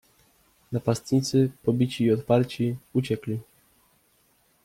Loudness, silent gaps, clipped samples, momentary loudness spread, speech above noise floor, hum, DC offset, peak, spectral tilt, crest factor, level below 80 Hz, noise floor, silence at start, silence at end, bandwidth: -26 LUFS; none; under 0.1%; 8 LU; 41 dB; none; under 0.1%; -8 dBFS; -7 dB/octave; 18 dB; -62 dBFS; -65 dBFS; 0.7 s; 1.2 s; 16 kHz